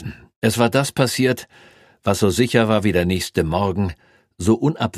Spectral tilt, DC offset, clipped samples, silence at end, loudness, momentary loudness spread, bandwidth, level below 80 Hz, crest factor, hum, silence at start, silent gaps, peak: -5.5 dB/octave; under 0.1%; under 0.1%; 0 s; -19 LUFS; 8 LU; 15.5 kHz; -44 dBFS; 18 dB; none; 0 s; 0.36-0.42 s; 0 dBFS